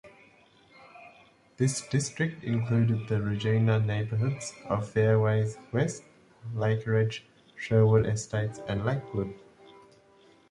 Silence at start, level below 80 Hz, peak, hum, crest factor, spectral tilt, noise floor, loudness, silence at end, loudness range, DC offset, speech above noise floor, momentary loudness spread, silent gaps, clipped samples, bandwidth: 0.05 s; -56 dBFS; -10 dBFS; none; 18 dB; -6.5 dB/octave; -59 dBFS; -28 LUFS; 1.15 s; 2 LU; under 0.1%; 32 dB; 10 LU; none; under 0.1%; 11.5 kHz